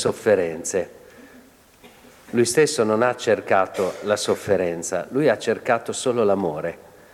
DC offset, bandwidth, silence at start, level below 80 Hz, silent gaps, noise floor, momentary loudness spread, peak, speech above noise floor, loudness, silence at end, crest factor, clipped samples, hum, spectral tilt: under 0.1%; 16 kHz; 0 s; -62 dBFS; none; -50 dBFS; 8 LU; -6 dBFS; 29 dB; -22 LUFS; 0.35 s; 16 dB; under 0.1%; none; -4 dB/octave